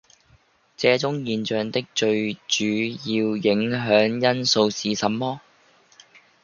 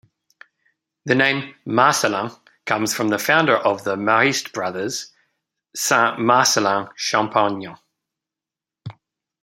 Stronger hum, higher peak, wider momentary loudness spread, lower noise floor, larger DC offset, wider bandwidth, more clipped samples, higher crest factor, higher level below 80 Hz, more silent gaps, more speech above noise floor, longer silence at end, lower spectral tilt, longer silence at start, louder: neither; about the same, -2 dBFS vs -2 dBFS; second, 6 LU vs 19 LU; second, -59 dBFS vs -88 dBFS; neither; second, 7.2 kHz vs 16.5 kHz; neither; about the same, 20 dB vs 20 dB; about the same, -64 dBFS vs -68 dBFS; neither; second, 37 dB vs 69 dB; first, 1.05 s vs 0.5 s; about the same, -4 dB/octave vs -3 dB/octave; second, 0.8 s vs 1.05 s; second, -22 LUFS vs -19 LUFS